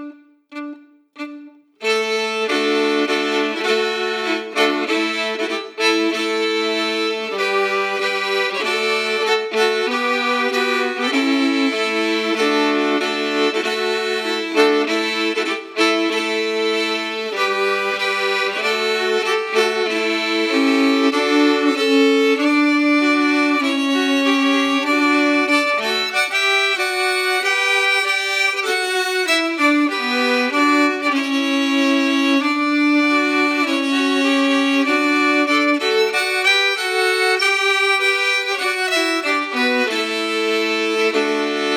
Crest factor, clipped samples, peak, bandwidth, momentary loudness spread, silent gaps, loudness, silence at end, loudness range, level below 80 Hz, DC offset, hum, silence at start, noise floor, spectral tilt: 16 dB; under 0.1%; -2 dBFS; 17 kHz; 5 LU; none; -17 LUFS; 0 s; 3 LU; -88 dBFS; under 0.1%; none; 0 s; -40 dBFS; -2 dB/octave